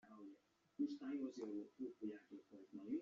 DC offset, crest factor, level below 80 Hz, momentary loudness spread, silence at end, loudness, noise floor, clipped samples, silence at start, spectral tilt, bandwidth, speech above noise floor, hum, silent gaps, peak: under 0.1%; 16 dB; under -90 dBFS; 15 LU; 0 s; -50 LUFS; -69 dBFS; under 0.1%; 0.05 s; -6 dB/octave; 7.4 kHz; 19 dB; none; none; -32 dBFS